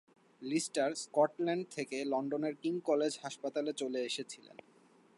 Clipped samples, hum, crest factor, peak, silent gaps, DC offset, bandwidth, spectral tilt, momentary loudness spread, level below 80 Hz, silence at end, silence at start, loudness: under 0.1%; none; 20 dB; -16 dBFS; none; under 0.1%; 11.5 kHz; -4 dB/octave; 8 LU; under -90 dBFS; 0.8 s; 0.4 s; -36 LUFS